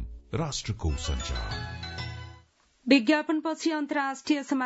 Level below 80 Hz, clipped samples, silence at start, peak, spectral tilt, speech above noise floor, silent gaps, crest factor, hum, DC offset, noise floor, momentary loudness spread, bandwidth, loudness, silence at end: -40 dBFS; under 0.1%; 0 s; -8 dBFS; -5 dB/octave; 32 dB; none; 22 dB; none; under 0.1%; -60 dBFS; 14 LU; 8 kHz; -29 LUFS; 0 s